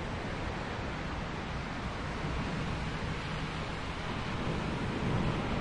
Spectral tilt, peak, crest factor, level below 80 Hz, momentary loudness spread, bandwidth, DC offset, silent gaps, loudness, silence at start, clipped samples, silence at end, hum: -6 dB/octave; -20 dBFS; 16 dB; -44 dBFS; 5 LU; 11 kHz; under 0.1%; none; -36 LUFS; 0 s; under 0.1%; 0 s; none